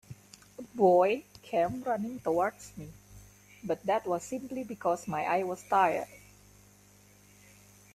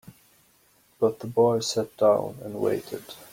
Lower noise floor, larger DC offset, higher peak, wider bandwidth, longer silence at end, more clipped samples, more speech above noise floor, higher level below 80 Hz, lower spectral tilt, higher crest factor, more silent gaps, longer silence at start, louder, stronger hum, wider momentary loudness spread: about the same, -59 dBFS vs -62 dBFS; neither; about the same, -12 dBFS vs -10 dBFS; second, 14.5 kHz vs 16.5 kHz; first, 1.75 s vs 0.05 s; neither; second, 30 dB vs 37 dB; about the same, -66 dBFS vs -66 dBFS; about the same, -5.5 dB/octave vs -5 dB/octave; about the same, 20 dB vs 18 dB; neither; about the same, 0.1 s vs 0.05 s; second, -30 LUFS vs -25 LUFS; first, 50 Hz at -55 dBFS vs none; first, 21 LU vs 12 LU